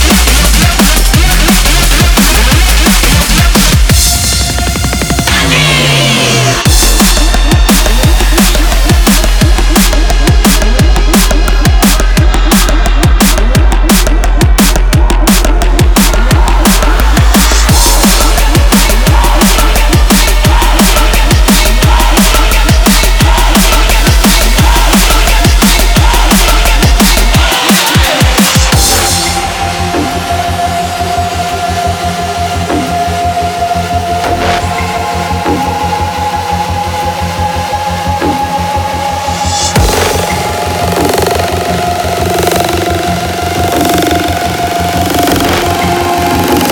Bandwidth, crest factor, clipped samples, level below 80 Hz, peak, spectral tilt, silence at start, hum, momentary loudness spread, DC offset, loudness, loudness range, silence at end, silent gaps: over 20 kHz; 8 dB; 0.5%; -10 dBFS; 0 dBFS; -3.5 dB/octave; 0 s; none; 6 LU; under 0.1%; -8 LUFS; 6 LU; 0 s; none